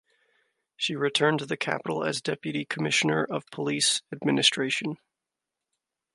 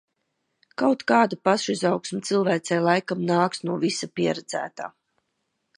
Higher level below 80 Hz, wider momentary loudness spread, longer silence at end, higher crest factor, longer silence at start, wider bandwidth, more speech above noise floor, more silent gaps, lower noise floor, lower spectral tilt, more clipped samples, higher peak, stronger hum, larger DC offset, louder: about the same, -74 dBFS vs -72 dBFS; about the same, 9 LU vs 11 LU; first, 1.2 s vs 0.9 s; about the same, 20 dB vs 20 dB; about the same, 0.8 s vs 0.8 s; about the same, 11.5 kHz vs 11.5 kHz; first, 60 dB vs 53 dB; neither; first, -87 dBFS vs -76 dBFS; second, -3 dB/octave vs -5 dB/octave; neither; second, -8 dBFS vs -4 dBFS; neither; neither; about the same, -26 LUFS vs -24 LUFS